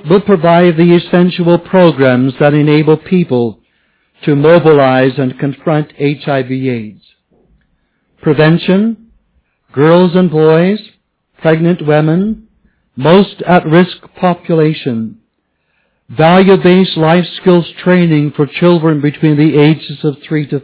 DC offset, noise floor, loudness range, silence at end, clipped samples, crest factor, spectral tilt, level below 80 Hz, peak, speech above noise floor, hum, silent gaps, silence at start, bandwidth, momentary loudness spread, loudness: under 0.1%; -63 dBFS; 5 LU; 0.05 s; 1%; 10 dB; -11.5 dB/octave; -48 dBFS; 0 dBFS; 54 dB; none; none; 0.05 s; 4 kHz; 10 LU; -10 LUFS